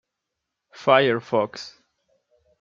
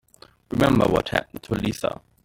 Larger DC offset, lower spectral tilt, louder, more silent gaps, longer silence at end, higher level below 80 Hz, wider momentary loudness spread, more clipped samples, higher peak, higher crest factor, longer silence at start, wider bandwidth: neither; about the same, -5.5 dB/octave vs -6 dB/octave; about the same, -21 LUFS vs -23 LUFS; neither; first, 0.9 s vs 0.3 s; second, -70 dBFS vs -44 dBFS; first, 19 LU vs 11 LU; neither; about the same, -2 dBFS vs -2 dBFS; about the same, 22 dB vs 20 dB; first, 0.8 s vs 0.5 s; second, 7.6 kHz vs 17 kHz